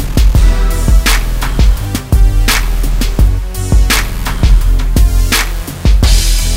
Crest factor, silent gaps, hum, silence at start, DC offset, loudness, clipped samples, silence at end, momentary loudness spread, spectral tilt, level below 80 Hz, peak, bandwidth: 8 dB; none; none; 0 s; under 0.1%; -12 LUFS; under 0.1%; 0 s; 6 LU; -4 dB/octave; -10 dBFS; 0 dBFS; 16.5 kHz